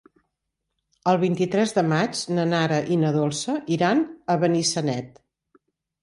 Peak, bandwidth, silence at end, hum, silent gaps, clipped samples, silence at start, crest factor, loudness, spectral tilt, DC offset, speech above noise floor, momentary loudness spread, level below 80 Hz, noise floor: -6 dBFS; 11.5 kHz; 0.95 s; none; none; under 0.1%; 1.05 s; 18 dB; -23 LUFS; -5 dB/octave; under 0.1%; 58 dB; 6 LU; -66 dBFS; -80 dBFS